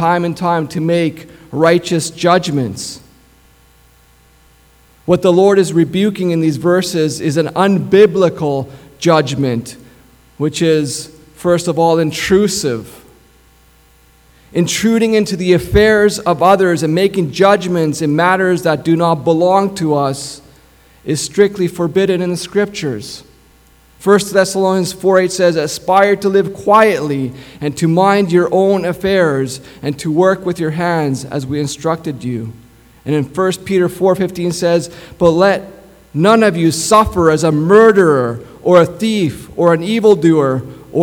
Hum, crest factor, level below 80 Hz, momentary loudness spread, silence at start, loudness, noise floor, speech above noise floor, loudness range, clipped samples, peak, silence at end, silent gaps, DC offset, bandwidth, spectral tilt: none; 14 dB; -42 dBFS; 12 LU; 0 s; -13 LUFS; -48 dBFS; 35 dB; 6 LU; under 0.1%; 0 dBFS; 0 s; none; under 0.1%; 18 kHz; -5.5 dB/octave